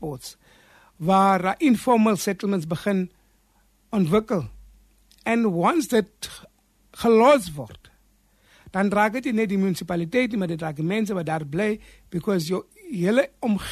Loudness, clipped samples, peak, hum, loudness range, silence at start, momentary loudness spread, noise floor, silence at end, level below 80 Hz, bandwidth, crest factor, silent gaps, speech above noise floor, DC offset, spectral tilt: -23 LUFS; under 0.1%; -6 dBFS; none; 3 LU; 0 s; 15 LU; -62 dBFS; 0 s; -54 dBFS; 13.5 kHz; 18 dB; none; 40 dB; under 0.1%; -6 dB/octave